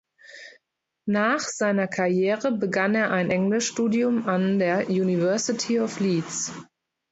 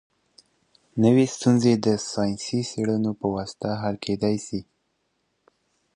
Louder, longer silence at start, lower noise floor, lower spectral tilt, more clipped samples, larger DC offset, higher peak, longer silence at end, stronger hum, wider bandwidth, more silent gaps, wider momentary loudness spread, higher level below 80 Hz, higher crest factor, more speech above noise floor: about the same, -24 LUFS vs -24 LUFS; second, 0.3 s vs 0.95 s; first, -79 dBFS vs -73 dBFS; about the same, -5 dB/octave vs -6 dB/octave; neither; neither; about the same, -8 dBFS vs -6 dBFS; second, 0.5 s vs 1.35 s; neither; second, 8.2 kHz vs 10.5 kHz; neither; second, 7 LU vs 10 LU; second, -68 dBFS vs -58 dBFS; about the same, 16 dB vs 18 dB; first, 56 dB vs 50 dB